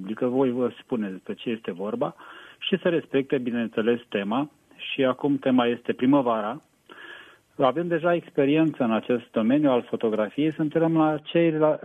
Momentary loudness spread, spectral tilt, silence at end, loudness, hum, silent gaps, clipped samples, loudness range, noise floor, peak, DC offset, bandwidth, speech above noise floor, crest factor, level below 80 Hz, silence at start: 11 LU; -8 dB/octave; 0.1 s; -25 LUFS; none; none; under 0.1%; 4 LU; -47 dBFS; -8 dBFS; under 0.1%; 8.4 kHz; 23 dB; 16 dB; -70 dBFS; 0 s